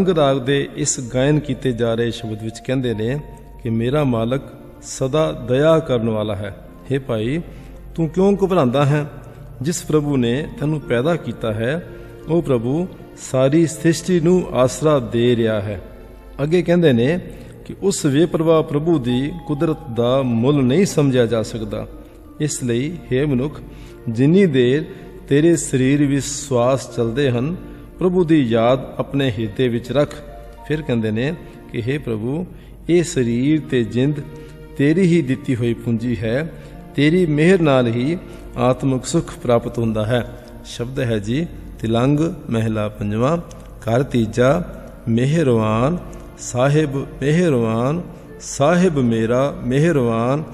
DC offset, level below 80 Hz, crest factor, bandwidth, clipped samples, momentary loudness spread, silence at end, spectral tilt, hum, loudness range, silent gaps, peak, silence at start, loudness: under 0.1%; -40 dBFS; 16 dB; 14 kHz; under 0.1%; 15 LU; 0 s; -6.5 dB/octave; none; 4 LU; none; -2 dBFS; 0 s; -19 LUFS